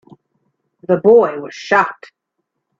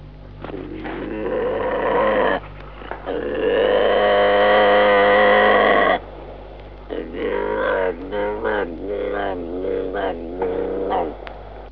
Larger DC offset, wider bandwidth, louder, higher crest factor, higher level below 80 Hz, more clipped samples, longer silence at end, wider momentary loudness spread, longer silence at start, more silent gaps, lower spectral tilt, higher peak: second, under 0.1% vs 0.3%; first, 7.4 kHz vs 5.2 kHz; first, -14 LUFS vs -19 LUFS; about the same, 16 dB vs 18 dB; second, -62 dBFS vs -40 dBFS; neither; first, 0.85 s vs 0 s; second, 15 LU vs 21 LU; first, 0.9 s vs 0 s; neither; second, -6 dB/octave vs -8 dB/octave; about the same, 0 dBFS vs -2 dBFS